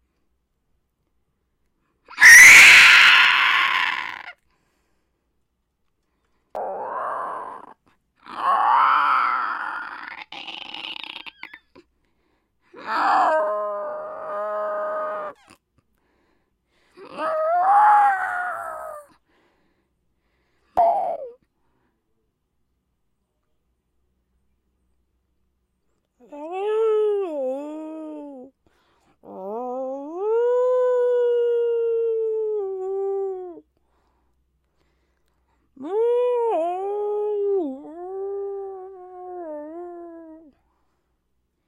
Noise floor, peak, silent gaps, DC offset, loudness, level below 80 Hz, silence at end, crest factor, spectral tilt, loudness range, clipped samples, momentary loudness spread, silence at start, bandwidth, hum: -73 dBFS; 0 dBFS; none; under 0.1%; -16 LUFS; -64 dBFS; 1.35 s; 22 dB; 0.5 dB/octave; 23 LU; under 0.1%; 23 LU; 2.1 s; 16 kHz; none